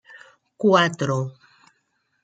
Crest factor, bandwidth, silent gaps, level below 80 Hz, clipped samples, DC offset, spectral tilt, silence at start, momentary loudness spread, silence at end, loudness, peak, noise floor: 22 dB; 9.2 kHz; none; -70 dBFS; under 0.1%; under 0.1%; -5.5 dB/octave; 0.15 s; 10 LU; 0.95 s; -21 LUFS; -4 dBFS; -71 dBFS